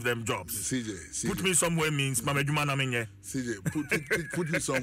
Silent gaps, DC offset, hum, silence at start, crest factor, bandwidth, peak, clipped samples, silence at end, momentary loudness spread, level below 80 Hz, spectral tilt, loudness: none; under 0.1%; none; 0 s; 16 dB; 16 kHz; -14 dBFS; under 0.1%; 0 s; 9 LU; -56 dBFS; -3.5 dB/octave; -29 LUFS